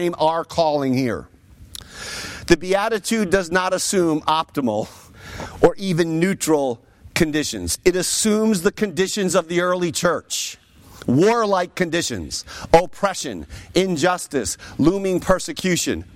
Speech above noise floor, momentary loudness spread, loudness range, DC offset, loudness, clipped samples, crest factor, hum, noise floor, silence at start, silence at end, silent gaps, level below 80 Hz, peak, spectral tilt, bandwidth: 21 dB; 12 LU; 2 LU; under 0.1%; -20 LUFS; under 0.1%; 18 dB; none; -41 dBFS; 0 s; 0.1 s; none; -44 dBFS; -2 dBFS; -4 dB/octave; 16.5 kHz